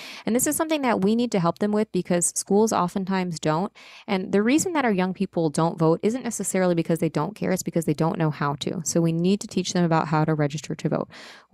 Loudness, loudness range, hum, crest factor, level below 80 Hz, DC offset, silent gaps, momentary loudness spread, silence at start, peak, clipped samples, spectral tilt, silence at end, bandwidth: -24 LUFS; 1 LU; none; 16 dB; -60 dBFS; under 0.1%; none; 6 LU; 0 s; -8 dBFS; under 0.1%; -5.5 dB/octave; 0.15 s; 16 kHz